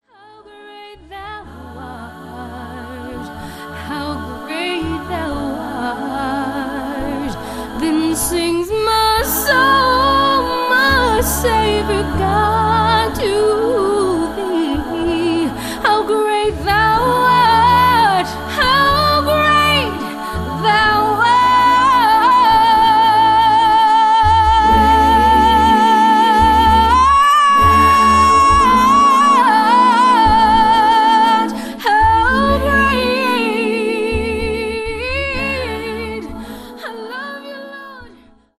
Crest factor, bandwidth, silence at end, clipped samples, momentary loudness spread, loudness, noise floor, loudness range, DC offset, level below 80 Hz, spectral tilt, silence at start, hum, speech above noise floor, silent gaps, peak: 14 dB; 13.5 kHz; 0.5 s; under 0.1%; 18 LU; -13 LUFS; -45 dBFS; 13 LU; under 0.1%; -30 dBFS; -4 dB/octave; 0.6 s; none; 30 dB; none; 0 dBFS